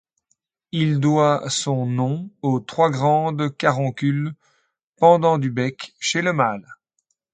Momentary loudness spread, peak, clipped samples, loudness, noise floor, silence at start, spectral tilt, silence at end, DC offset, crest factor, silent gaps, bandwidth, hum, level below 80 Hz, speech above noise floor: 9 LU; -2 dBFS; under 0.1%; -20 LUFS; -73 dBFS; 0.75 s; -5.5 dB/octave; 0.6 s; under 0.1%; 20 dB; 4.84-4.93 s; 9.4 kHz; none; -64 dBFS; 53 dB